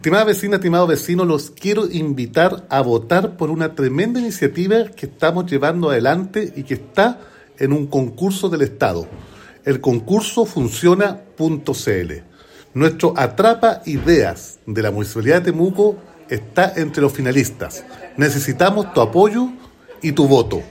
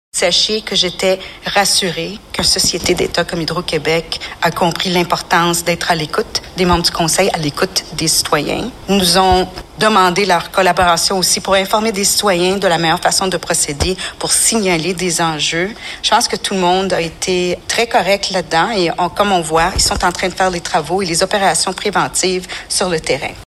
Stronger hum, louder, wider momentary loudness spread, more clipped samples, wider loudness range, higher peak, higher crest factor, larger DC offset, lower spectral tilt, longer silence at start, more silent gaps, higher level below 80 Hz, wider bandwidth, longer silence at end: neither; second, -17 LUFS vs -14 LUFS; first, 10 LU vs 6 LU; neither; about the same, 2 LU vs 3 LU; about the same, 0 dBFS vs 0 dBFS; about the same, 16 dB vs 14 dB; neither; first, -6 dB/octave vs -2.5 dB/octave; second, 0 s vs 0.15 s; neither; second, -46 dBFS vs -36 dBFS; about the same, 16.5 kHz vs 16 kHz; about the same, 0 s vs 0 s